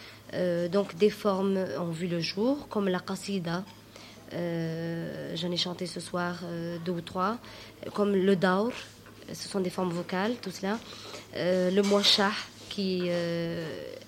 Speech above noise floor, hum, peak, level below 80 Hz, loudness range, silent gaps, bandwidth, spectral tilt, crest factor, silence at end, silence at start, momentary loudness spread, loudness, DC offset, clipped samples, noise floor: 20 dB; none; -10 dBFS; -64 dBFS; 6 LU; none; 16.5 kHz; -5 dB/octave; 20 dB; 0 s; 0 s; 15 LU; -30 LUFS; under 0.1%; under 0.1%; -49 dBFS